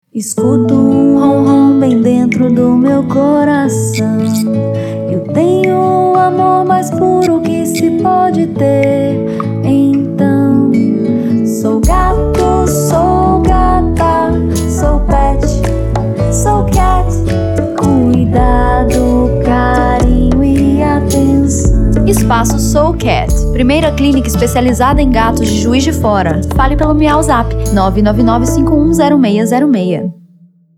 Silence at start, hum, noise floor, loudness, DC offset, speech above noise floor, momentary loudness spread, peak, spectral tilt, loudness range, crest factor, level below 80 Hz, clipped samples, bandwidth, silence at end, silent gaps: 0.15 s; none; -45 dBFS; -11 LUFS; under 0.1%; 35 dB; 4 LU; 0 dBFS; -6.5 dB/octave; 2 LU; 10 dB; -18 dBFS; under 0.1%; 17 kHz; 0.65 s; none